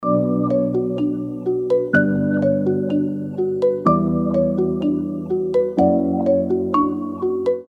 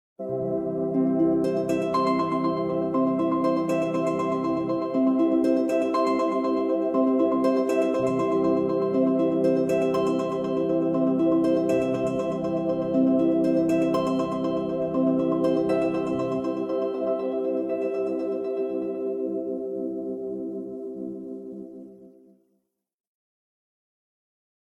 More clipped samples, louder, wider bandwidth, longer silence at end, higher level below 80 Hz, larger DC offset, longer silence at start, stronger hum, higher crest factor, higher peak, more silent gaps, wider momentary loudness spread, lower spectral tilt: neither; first, -19 LUFS vs -25 LUFS; second, 6.2 kHz vs 12 kHz; second, 0.05 s vs 2.6 s; first, -50 dBFS vs -60 dBFS; neither; second, 0 s vs 0.2 s; neither; about the same, 16 dB vs 14 dB; first, -2 dBFS vs -10 dBFS; neither; second, 6 LU vs 9 LU; first, -10 dB/octave vs -7.5 dB/octave